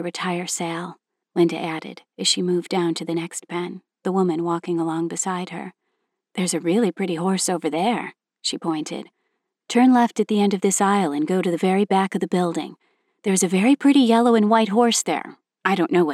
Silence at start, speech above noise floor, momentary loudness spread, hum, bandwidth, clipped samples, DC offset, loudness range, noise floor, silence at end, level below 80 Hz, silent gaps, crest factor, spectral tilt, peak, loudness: 0 s; 55 dB; 14 LU; none; 14.5 kHz; under 0.1%; under 0.1%; 6 LU; -76 dBFS; 0 s; -82 dBFS; none; 18 dB; -4.5 dB/octave; -4 dBFS; -21 LUFS